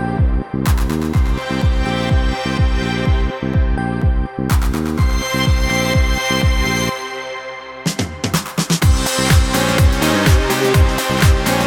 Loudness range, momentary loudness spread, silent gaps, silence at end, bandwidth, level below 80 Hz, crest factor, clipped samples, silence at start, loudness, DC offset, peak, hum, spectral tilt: 3 LU; 7 LU; none; 0 s; 18.5 kHz; -20 dBFS; 14 dB; under 0.1%; 0 s; -17 LUFS; under 0.1%; 0 dBFS; none; -5 dB/octave